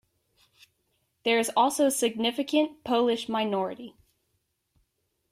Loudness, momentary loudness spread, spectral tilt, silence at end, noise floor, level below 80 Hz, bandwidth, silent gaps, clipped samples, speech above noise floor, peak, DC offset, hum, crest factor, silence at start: -26 LUFS; 9 LU; -3 dB/octave; 1.45 s; -76 dBFS; -72 dBFS; 16 kHz; none; under 0.1%; 50 dB; -10 dBFS; under 0.1%; none; 18 dB; 1.25 s